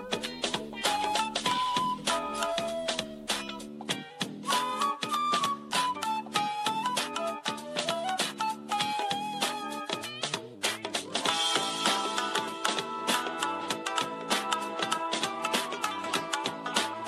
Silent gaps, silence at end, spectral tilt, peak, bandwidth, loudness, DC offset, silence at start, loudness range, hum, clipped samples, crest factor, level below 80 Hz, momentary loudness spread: none; 0 s; -1.5 dB/octave; -10 dBFS; 14.5 kHz; -30 LUFS; under 0.1%; 0 s; 2 LU; none; under 0.1%; 22 dB; -66 dBFS; 6 LU